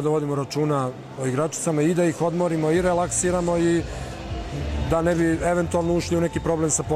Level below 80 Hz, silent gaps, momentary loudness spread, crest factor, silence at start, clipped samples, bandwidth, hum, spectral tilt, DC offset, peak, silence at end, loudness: -38 dBFS; none; 9 LU; 14 dB; 0 s; under 0.1%; 15 kHz; none; -5.5 dB/octave; under 0.1%; -8 dBFS; 0 s; -23 LUFS